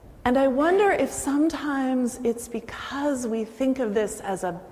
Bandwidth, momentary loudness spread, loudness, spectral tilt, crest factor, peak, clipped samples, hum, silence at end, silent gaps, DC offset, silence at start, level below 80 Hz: 16 kHz; 10 LU; -25 LUFS; -4.5 dB/octave; 14 dB; -10 dBFS; under 0.1%; none; 0 s; none; under 0.1%; 0.05 s; -52 dBFS